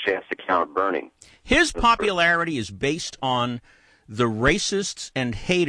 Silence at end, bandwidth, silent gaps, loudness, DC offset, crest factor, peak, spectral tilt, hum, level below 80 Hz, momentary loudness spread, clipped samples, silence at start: 0 s; 10.5 kHz; none; -22 LUFS; under 0.1%; 18 dB; -4 dBFS; -4 dB/octave; none; -42 dBFS; 9 LU; under 0.1%; 0 s